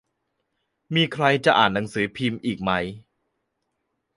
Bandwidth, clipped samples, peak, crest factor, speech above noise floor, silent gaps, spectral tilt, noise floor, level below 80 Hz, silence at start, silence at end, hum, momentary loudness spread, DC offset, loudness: 11.5 kHz; under 0.1%; -4 dBFS; 22 dB; 55 dB; none; -5.5 dB/octave; -77 dBFS; -56 dBFS; 0.9 s; 1.15 s; none; 9 LU; under 0.1%; -22 LUFS